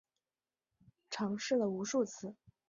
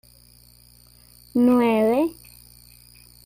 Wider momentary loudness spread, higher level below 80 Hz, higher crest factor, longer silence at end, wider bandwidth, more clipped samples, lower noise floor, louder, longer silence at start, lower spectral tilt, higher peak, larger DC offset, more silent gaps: first, 13 LU vs 10 LU; second, -80 dBFS vs -56 dBFS; about the same, 18 dB vs 14 dB; second, 0.35 s vs 1.15 s; second, 7.4 kHz vs 16 kHz; neither; first, under -90 dBFS vs -52 dBFS; second, -36 LUFS vs -20 LUFS; second, 1.1 s vs 1.35 s; second, -4.5 dB/octave vs -6 dB/octave; second, -22 dBFS vs -10 dBFS; neither; neither